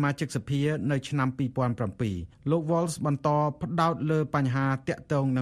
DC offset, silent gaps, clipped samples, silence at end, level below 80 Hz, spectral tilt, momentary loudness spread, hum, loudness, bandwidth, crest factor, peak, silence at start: under 0.1%; none; under 0.1%; 0 s; -56 dBFS; -7 dB/octave; 5 LU; none; -28 LUFS; 13.5 kHz; 16 dB; -12 dBFS; 0 s